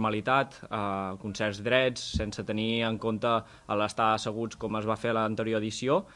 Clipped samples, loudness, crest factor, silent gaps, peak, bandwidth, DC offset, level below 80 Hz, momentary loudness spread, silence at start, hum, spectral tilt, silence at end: under 0.1%; -29 LUFS; 20 dB; none; -10 dBFS; 11.5 kHz; under 0.1%; -52 dBFS; 8 LU; 0 s; none; -5 dB/octave; 0 s